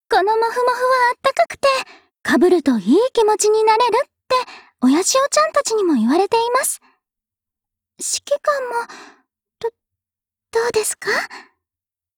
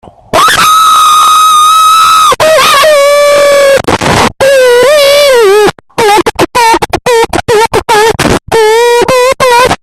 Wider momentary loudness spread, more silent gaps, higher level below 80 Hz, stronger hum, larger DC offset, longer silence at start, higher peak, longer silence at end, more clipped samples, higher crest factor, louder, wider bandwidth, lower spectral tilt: first, 13 LU vs 5 LU; neither; second, -60 dBFS vs -32 dBFS; neither; neither; second, 0.1 s vs 0.35 s; second, -4 dBFS vs 0 dBFS; first, 0.75 s vs 0.05 s; second, under 0.1% vs 1%; first, 14 dB vs 4 dB; second, -17 LUFS vs -4 LUFS; first, 20 kHz vs 17 kHz; about the same, -2.5 dB/octave vs -2.5 dB/octave